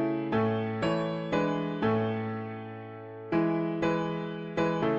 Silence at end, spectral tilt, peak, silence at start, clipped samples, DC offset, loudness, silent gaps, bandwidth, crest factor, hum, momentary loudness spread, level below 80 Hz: 0 s; -7.5 dB/octave; -14 dBFS; 0 s; under 0.1%; under 0.1%; -30 LUFS; none; 7.8 kHz; 14 dB; none; 12 LU; -60 dBFS